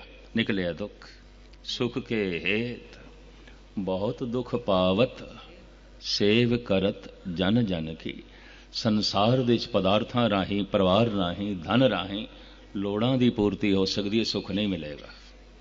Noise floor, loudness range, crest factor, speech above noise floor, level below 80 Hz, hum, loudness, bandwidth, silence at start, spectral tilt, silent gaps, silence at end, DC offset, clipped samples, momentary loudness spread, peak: -49 dBFS; 6 LU; 20 dB; 23 dB; -50 dBFS; none; -26 LUFS; 7.6 kHz; 0 s; -6 dB/octave; none; 0 s; under 0.1%; under 0.1%; 16 LU; -8 dBFS